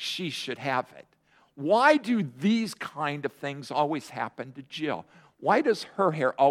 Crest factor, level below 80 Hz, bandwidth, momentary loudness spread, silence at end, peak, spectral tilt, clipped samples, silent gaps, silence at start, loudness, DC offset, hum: 22 dB; -76 dBFS; 15 kHz; 14 LU; 0 s; -6 dBFS; -5.5 dB/octave; under 0.1%; none; 0 s; -27 LUFS; under 0.1%; none